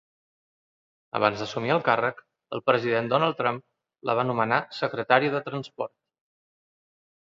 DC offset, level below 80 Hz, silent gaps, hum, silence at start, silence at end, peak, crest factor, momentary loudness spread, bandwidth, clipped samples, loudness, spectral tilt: under 0.1%; -70 dBFS; none; none; 1.15 s; 1.35 s; -4 dBFS; 24 dB; 13 LU; 7.6 kHz; under 0.1%; -26 LUFS; -6 dB/octave